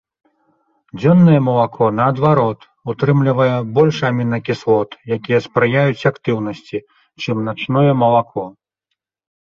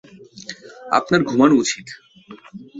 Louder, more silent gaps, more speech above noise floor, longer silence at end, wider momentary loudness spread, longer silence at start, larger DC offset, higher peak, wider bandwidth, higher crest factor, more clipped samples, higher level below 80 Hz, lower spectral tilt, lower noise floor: about the same, -16 LUFS vs -17 LUFS; neither; first, 62 dB vs 26 dB; first, 0.95 s vs 0 s; second, 15 LU vs 24 LU; first, 0.95 s vs 0.35 s; neither; about the same, -2 dBFS vs -2 dBFS; second, 7 kHz vs 8 kHz; second, 14 dB vs 20 dB; neither; about the same, -54 dBFS vs -58 dBFS; first, -8.5 dB/octave vs -4.5 dB/octave; first, -77 dBFS vs -43 dBFS